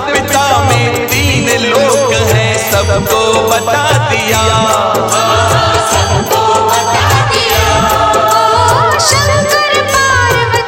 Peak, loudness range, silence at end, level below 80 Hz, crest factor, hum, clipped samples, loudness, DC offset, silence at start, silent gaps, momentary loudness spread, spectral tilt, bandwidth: 0 dBFS; 1 LU; 0 s; -30 dBFS; 10 dB; none; 0.1%; -9 LUFS; under 0.1%; 0 s; none; 2 LU; -3.5 dB/octave; 17.5 kHz